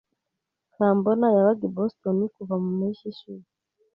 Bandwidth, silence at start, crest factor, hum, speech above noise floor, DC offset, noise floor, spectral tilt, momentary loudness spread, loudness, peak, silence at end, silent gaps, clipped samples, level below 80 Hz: 5.4 kHz; 0.8 s; 18 dB; none; 60 dB; under 0.1%; -83 dBFS; -11 dB/octave; 19 LU; -24 LUFS; -8 dBFS; 0.55 s; none; under 0.1%; -70 dBFS